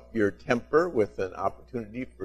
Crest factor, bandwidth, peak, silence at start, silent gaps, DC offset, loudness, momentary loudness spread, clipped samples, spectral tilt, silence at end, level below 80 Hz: 22 dB; 11.5 kHz; -6 dBFS; 0.1 s; none; under 0.1%; -28 LUFS; 13 LU; under 0.1%; -7 dB/octave; 0 s; -54 dBFS